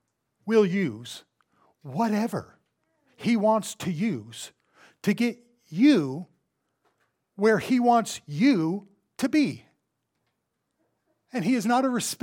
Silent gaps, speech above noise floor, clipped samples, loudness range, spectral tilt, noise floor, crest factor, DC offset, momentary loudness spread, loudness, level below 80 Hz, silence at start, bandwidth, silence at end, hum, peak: none; 55 dB; under 0.1%; 4 LU; -5.5 dB/octave; -79 dBFS; 18 dB; under 0.1%; 17 LU; -25 LUFS; -74 dBFS; 0.45 s; 18 kHz; 0.05 s; none; -8 dBFS